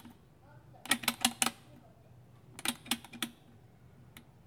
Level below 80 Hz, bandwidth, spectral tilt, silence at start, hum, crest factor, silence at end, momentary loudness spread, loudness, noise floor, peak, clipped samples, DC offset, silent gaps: -70 dBFS; over 20 kHz; -1 dB/octave; 0.05 s; none; 32 dB; 0.25 s; 26 LU; -34 LUFS; -59 dBFS; -8 dBFS; under 0.1%; under 0.1%; none